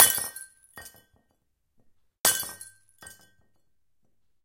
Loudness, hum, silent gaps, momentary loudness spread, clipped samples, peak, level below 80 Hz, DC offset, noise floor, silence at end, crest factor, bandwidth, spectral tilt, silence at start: -24 LUFS; none; 2.20-2.24 s; 25 LU; under 0.1%; 0 dBFS; -66 dBFS; under 0.1%; -78 dBFS; 1.35 s; 30 dB; 17 kHz; 1 dB/octave; 0 s